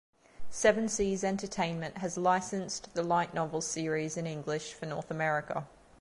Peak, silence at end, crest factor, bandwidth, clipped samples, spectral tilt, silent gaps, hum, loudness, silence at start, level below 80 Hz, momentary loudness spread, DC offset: -12 dBFS; 0.35 s; 20 dB; 11.5 kHz; under 0.1%; -4.5 dB/octave; none; none; -32 LUFS; 0.4 s; -60 dBFS; 10 LU; under 0.1%